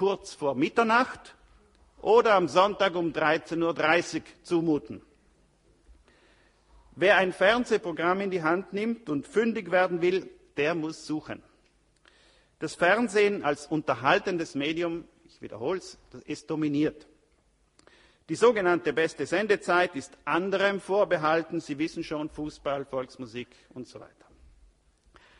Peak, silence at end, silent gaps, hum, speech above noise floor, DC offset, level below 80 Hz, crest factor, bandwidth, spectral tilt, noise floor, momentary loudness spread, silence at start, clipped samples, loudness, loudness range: -6 dBFS; 1.35 s; none; none; 40 dB; under 0.1%; -62 dBFS; 22 dB; 11 kHz; -5 dB/octave; -67 dBFS; 16 LU; 0 s; under 0.1%; -27 LUFS; 7 LU